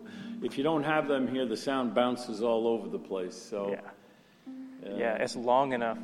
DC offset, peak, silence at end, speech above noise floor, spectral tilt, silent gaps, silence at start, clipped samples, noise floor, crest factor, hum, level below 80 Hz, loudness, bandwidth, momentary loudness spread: under 0.1%; -12 dBFS; 0 s; 28 dB; -5 dB/octave; none; 0 s; under 0.1%; -58 dBFS; 18 dB; none; -72 dBFS; -31 LUFS; 13 kHz; 14 LU